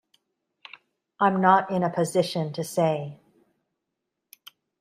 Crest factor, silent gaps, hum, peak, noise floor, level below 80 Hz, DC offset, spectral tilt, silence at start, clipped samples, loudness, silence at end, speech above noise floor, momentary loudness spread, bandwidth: 24 dB; none; none; -4 dBFS; -83 dBFS; -72 dBFS; under 0.1%; -5.5 dB/octave; 1.2 s; under 0.1%; -24 LUFS; 1.65 s; 60 dB; 24 LU; 15.5 kHz